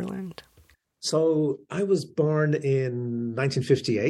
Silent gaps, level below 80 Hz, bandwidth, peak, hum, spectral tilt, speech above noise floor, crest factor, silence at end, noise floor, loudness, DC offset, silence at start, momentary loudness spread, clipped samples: none; -66 dBFS; 12.5 kHz; -8 dBFS; none; -6 dB/octave; 36 dB; 16 dB; 0 s; -60 dBFS; -26 LUFS; under 0.1%; 0 s; 9 LU; under 0.1%